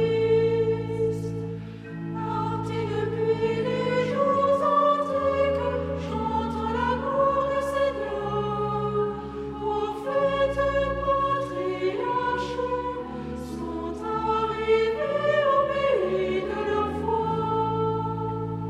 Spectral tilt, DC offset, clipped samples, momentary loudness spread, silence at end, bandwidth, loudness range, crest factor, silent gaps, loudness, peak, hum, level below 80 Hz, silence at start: -7 dB/octave; under 0.1%; under 0.1%; 10 LU; 0 s; 11.5 kHz; 4 LU; 16 dB; none; -26 LUFS; -10 dBFS; none; -46 dBFS; 0 s